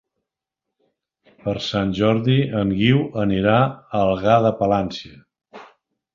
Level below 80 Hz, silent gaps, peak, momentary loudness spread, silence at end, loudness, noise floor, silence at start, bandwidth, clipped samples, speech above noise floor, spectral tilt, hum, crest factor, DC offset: -48 dBFS; none; -2 dBFS; 9 LU; 0.5 s; -19 LUFS; -84 dBFS; 1.45 s; 7.4 kHz; under 0.1%; 65 dB; -7.5 dB/octave; none; 18 dB; under 0.1%